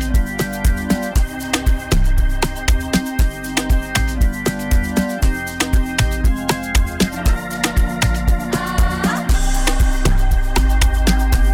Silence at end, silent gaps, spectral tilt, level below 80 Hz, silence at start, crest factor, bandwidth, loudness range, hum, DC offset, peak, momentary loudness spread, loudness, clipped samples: 0 s; none; -4.5 dB/octave; -16 dBFS; 0 s; 10 dB; 18 kHz; 1 LU; none; under 0.1%; -6 dBFS; 3 LU; -19 LUFS; under 0.1%